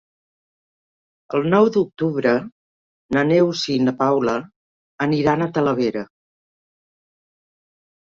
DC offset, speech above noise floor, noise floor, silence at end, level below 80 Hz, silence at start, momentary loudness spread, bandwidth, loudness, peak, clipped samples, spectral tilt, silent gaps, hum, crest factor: under 0.1%; over 72 dB; under -90 dBFS; 2.05 s; -58 dBFS; 1.3 s; 9 LU; 7.8 kHz; -19 LUFS; -4 dBFS; under 0.1%; -6.5 dB/octave; 2.52-3.09 s, 4.56-4.98 s; none; 18 dB